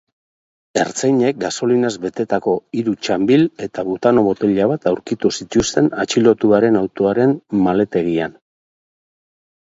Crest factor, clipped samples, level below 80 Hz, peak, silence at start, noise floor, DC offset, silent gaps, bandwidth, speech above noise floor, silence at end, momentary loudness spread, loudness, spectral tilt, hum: 16 dB; under 0.1%; -50 dBFS; 0 dBFS; 0.75 s; under -90 dBFS; under 0.1%; none; 8 kHz; over 74 dB; 1.4 s; 7 LU; -17 LUFS; -5.5 dB/octave; none